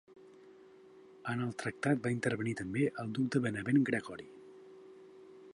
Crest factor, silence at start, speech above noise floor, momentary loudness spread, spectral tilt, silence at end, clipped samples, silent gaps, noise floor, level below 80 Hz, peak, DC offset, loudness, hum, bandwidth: 18 dB; 0.1 s; 24 dB; 24 LU; -6.5 dB/octave; 0 s; under 0.1%; none; -58 dBFS; -70 dBFS; -18 dBFS; under 0.1%; -34 LUFS; none; 11.5 kHz